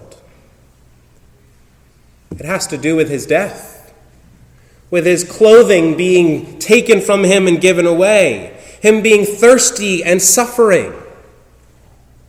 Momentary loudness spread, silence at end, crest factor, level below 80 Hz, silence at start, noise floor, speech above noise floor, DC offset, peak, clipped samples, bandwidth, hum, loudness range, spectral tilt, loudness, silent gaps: 12 LU; 1.25 s; 14 dB; -48 dBFS; 2.3 s; -48 dBFS; 37 dB; under 0.1%; 0 dBFS; 0.7%; 16.5 kHz; none; 10 LU; -3.5 dB/octave; -11 LUFS; none